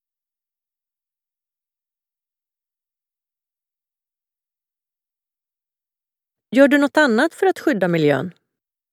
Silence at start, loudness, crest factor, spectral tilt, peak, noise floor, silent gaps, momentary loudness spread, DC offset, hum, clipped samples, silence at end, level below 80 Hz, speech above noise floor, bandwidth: 6.5 s; -17 LUFS; 22 dB; -6 dB/octave; -2 dBFS; under -90 dBFS; none; 8 LU; under 0.1%; none; under 0.1%; 0.65 s; -78 dBFS; over 74 dB; 15 kHz